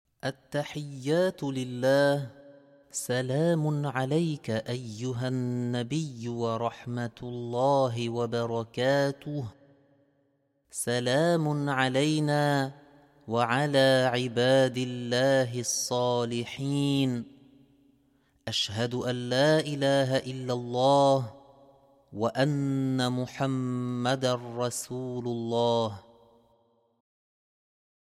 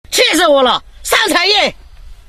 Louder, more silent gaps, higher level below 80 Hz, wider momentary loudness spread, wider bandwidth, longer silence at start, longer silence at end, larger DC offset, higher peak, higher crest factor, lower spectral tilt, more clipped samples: second, -28 LUFS vs -11 LUFS; neither; second, -68 dBFS vs -38 dBFS; first, 11 LU vs 6 LU; about the same, 15 kHz vs 14.5 kHz; first, 0.25 s vs 0.1 s; first, 2.15 s vs 0.15 s; neither; second, -10 dBFS vs 0 dBFS; about the same, 18 dB vs 14 dB; first, -5 dB/octave vs -1 dB/octave; neither